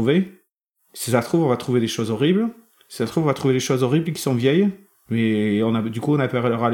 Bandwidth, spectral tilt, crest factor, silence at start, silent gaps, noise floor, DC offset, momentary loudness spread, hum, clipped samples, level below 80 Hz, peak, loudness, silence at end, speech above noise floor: 18 kHz; -6 dB/octave; 16 dB; 0 s; 0.51-0.74 s; -68 dBFS; under 0.1%; 8 LU; none; under 0.1%; -62 dBFS; -4 dBFS; -21 LUFS; 0 s; 49 dB